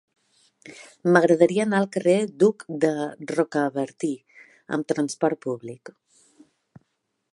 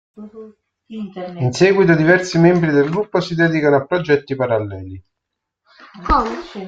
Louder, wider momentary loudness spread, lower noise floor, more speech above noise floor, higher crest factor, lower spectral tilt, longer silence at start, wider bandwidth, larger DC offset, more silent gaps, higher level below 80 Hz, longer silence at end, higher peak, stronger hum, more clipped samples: second, -23 LUFS vs -16 LUFS; second, 15 LU vs 19 LU; second, -74 dBFS vs -79 dBFS; second, 51 dB vs 63 dB; about the same, 22 dB vs 18 dB; about the same, -6 dB/octave vs -6.5 dB/octave; first, 0.65 s vs 0.2 s; first, 11.5 kHz vs 7.8 kHz; neither; neither; second, -76 dBFS vs -38 dBFS; first, 1.45 s vs 0 s; about the same, -2 dBFS vs 0 dBFS; neither; neither